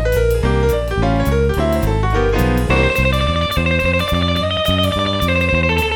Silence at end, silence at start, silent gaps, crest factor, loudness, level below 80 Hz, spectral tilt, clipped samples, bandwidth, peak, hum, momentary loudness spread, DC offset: 0 s; 0 s; none; 14 dB; -16 LUFS; -22 dBFS; -6 dB/octave; under 0.1%; 19.5 kHz; -2 dBFS; none; 2 LU; under 0.1%